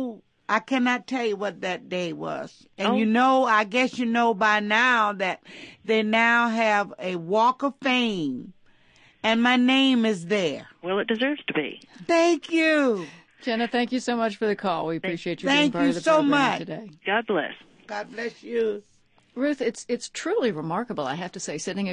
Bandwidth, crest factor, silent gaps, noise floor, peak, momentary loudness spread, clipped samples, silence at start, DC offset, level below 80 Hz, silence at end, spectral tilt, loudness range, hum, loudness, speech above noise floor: 10.5 kHz; 18 dB; none; -57 dBFS; -6 dBFS; 14 LU; under 0.1%; 0 s; under 0.1%; -72 dBFS; 0 s; -4.5 dB/octave; 7 LU; none; -24 LUFS; 33 dB